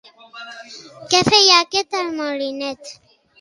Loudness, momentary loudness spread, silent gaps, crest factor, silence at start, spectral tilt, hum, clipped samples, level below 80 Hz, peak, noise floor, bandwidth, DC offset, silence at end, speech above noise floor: -15 LUFS; 25 LU; none; 20 dB; 0.35 s; -2 dB/octave; none; under 0.1%; -58 dBFS; 0 dBFS; -38 dBFS; 11.5 kHz; under 0.1%; 0.45 s; 20 dB